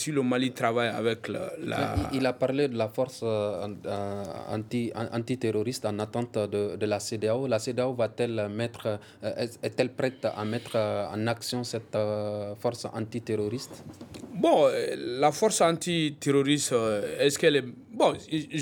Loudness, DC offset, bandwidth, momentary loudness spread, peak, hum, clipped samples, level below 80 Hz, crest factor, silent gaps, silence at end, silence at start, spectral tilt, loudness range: -28 LUFS; under 0.1%; 19 kHz; 10 LU; -8 dBFS; none; under 0.1%; -56 dBFS; 20 dB; none; 0 s; 0 s; -5 dB/octave; 6 LU